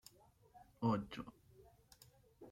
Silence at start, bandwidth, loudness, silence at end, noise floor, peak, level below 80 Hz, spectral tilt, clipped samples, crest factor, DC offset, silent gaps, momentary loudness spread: 0.55 s; 16.5 kHz; -42 LUFS; 0 s; -68 dBFS; -24 dBFS; -72 dBFS; -7 dB/octave; under 0.1%; 22 dB; under 0.1%; none; 27 LU